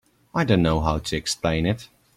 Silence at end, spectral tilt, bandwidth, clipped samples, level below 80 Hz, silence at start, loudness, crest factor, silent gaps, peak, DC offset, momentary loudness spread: 0.3 s; -5.5 dB/octave; 15 kHz; under 0.1%; -38 dBFS; 0.35 s; -23 LUFS; 18 dB; none; -6 dBFS; under 0.1%; 8 LU